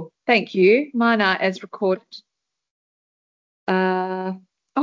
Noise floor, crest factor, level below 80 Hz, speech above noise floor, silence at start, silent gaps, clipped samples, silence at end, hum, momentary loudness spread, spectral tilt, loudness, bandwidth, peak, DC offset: under -90 dBFS; 18 dB; -72 dBFS; over 70 dB; 0 s; 2.71-3.67 s; under 0.1%; 0 s; none; 12 LU; -6.5 dB/octave; -20 LUFS; 7.4 kHz; -4 dBFS; under 0.1%